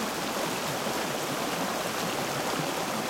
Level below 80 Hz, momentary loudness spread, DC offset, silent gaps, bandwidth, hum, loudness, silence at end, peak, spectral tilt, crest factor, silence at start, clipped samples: -62 dBFS; 1 LU; under 0.1%; none; 16.5 kHz; none; -30 LUFS; 0 s; -16 dBFS; -3 dB/octave; 14 dB; 0 s; under 0.1%